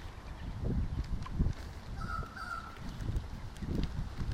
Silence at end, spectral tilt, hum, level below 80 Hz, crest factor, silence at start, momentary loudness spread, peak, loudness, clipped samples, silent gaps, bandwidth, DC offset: 0 s; -7 dB/octave; none; -40 dBFS; 18 dB; 0 s; 9 LU; -18 dBFS; -40 LUFS; under 0.1%; none; 14.5 kHz; under 0.1%